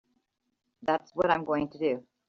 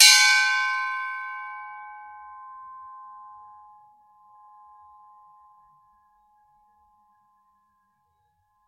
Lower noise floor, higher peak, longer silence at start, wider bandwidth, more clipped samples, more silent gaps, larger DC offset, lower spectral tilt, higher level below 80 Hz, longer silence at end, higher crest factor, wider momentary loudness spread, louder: first, -77 dBFS vs -70 dBFS; second, -8 dBFS vs 0 dBFS; first, 0.8 s vs 0 s; second, 7 kHz vs 15.5 kHz; neither; neither; neither; first, -4 dB/octave vs 7 dB/octave; first, -66 dBFS vs -80 dBFS; second, 0.3 s vs 5.5 s; about the same, 22 dB vs 26 dB; second, 5 LU vs 28 LU; second, -29 LUFS vs -20 LUFS